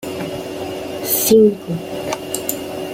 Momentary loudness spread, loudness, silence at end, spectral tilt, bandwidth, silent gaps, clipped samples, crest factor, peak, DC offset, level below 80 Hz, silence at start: 14 LU; -18 LUFS; 0 s; -4 dB/octave; 16.5 kHz; none; under 0.1%; 18 dB; 0 dBFS; under 0.1%; -52 dBFS; 0 s